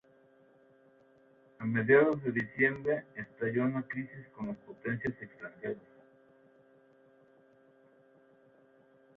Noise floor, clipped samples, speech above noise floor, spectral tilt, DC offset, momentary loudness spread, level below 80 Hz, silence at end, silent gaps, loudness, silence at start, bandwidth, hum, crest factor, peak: -64 dBFS; under 0.1%; 31 dB; -9.5 dB/octave; under 0.1%; 19 LU; -72 dBFS; 3.4 s; none; -32 LUFS; 1.6 s; 4.2 kHz; none; 24 dB; -12 dBFS